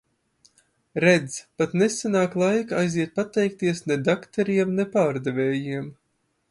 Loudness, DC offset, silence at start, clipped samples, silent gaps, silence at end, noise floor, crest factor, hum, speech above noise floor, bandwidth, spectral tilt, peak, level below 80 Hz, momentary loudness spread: -23 LUFS; under 0.1%; 0.95 s; under 0.1%; none; 0.55 s; -72 dBFS; 20 dB; none; 49 dB; 11.5 kHz; -5.5 dB/octave; -4 dBFS; -66 dBFS; 7 LU